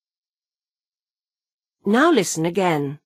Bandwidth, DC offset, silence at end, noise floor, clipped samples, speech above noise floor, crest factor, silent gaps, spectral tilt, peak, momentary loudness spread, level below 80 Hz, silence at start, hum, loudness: 15.5 kHz; under 0.1%; 0.1 s; under -90 dBFS; under 0.1%; over 71 dB; 18 dB; none; -4.5 dB/octave; -6 dBFS; 6 LU; -70 dBFS; 1.85 s; none; -19 LUFS